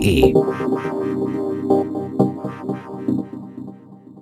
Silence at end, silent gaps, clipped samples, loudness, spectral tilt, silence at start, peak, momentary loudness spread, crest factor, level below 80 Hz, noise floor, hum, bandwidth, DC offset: 0 s; none; under 0.1%; -21 LUFS; -7 dB/octave; 0 s; 0 dBFS; 17 LU; 20 dB; -38 dBFS; -41 dBFS; none; 14.5 kHz; under 0.1%